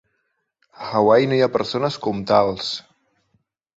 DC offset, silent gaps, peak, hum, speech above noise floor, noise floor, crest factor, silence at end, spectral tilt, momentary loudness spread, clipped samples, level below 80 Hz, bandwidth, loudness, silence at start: under 0.1%; none; -4 dBFS; none; 54 dB; -72 dBFS; 18 dB; 0.95 s; -6 dB/octave; 12 LU; under 0.1%; -58 dBFS; 8 kHz; -19 LUFS; 0.8 s